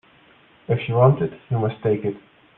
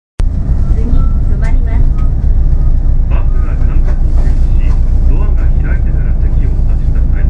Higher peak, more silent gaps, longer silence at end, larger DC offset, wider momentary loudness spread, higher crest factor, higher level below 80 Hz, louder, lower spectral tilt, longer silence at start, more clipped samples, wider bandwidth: about the same, -2 dBFS vs 0 dBFS; neither; first, 0.4 s vs 0 s; neither; first, 10 LU vs 1 LU; first, 20 dB vs 8 dB; second, -58 dBFS vs -8 dBFS; second, -21 LUFS vs -14 LUFS; first, -11.5 dB/octave vs -9.5 dB/octave; first, 0.7 s vs 0.2 s; second, under 0.1% vs 0.1%; first, 3.9 kHz vs 2.9 kHz